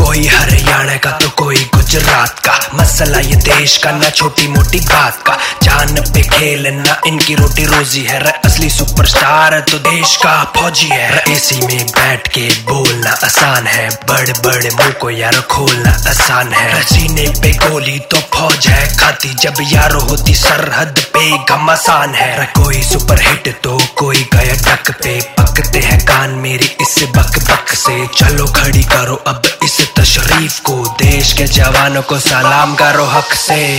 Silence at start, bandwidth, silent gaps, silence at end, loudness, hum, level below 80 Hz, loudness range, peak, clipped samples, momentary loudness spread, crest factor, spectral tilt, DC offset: 0 s; 19 kHz; none; 0 s; -9 LUFS; none; -18 dBFS; 1 LU; 0 dBFS; 0.6%; 4 LU; 10 dB; -3 dB/octave; under 0.1%